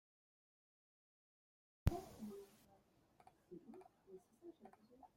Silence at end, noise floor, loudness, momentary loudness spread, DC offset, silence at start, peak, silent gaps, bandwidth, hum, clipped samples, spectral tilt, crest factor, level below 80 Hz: 0.1 s; -74 dBFS; -48 LUFS; 22 LU; under 0.1%; 1.85 s; -20 dBFS; none; 16.5 kHz; none; under 0.1%; -7.5 dB/octave; 32 dB; -58 dBFS